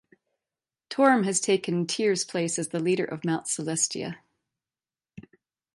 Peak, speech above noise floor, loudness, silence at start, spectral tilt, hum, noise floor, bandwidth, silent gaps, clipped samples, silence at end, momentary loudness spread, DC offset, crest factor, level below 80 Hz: -8 dBFS; over 64 dB; -26 LUFS; 0.9 s; -4 dB/octave; none; under -90 dBFS; 11.5 kHz; none; under 0.1%; 0.55 s; 10 LU; under 0.1%; 20 dB; -72 dBFS